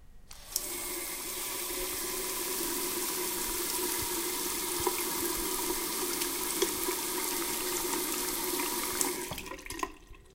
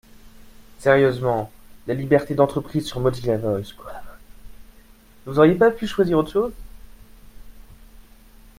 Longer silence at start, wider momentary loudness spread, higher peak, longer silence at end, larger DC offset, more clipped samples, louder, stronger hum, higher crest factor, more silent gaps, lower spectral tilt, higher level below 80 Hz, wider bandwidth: second, 0 s vs 0.25 s; second, 5 LU vs 20 LU; second, -6 dBFS vs -2 dBFS; second, 0.05 s vs 0.6 s; neither; neither; second, -32 LUFS vs -20 LUFS; neither; first, 28 dB vs 20 dB; neither; second, -1 dB/octave vs -7 dB/octave; second, -54 dBFS vs -44 dBFS; about the same, 17 kHz vs 16 kHz